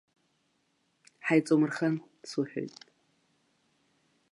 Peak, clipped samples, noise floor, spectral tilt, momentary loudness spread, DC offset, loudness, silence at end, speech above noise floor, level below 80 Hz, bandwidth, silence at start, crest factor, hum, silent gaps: -12 dBFS; under 0.1%; -74 dBFS; -6.5 dB/octave; 13 LU; under 0.1%; -30 LUFS; 1.65 s; 46 dB; -86 dBFS; 11.5 kHz; 1.25 s; 20 dB; none; none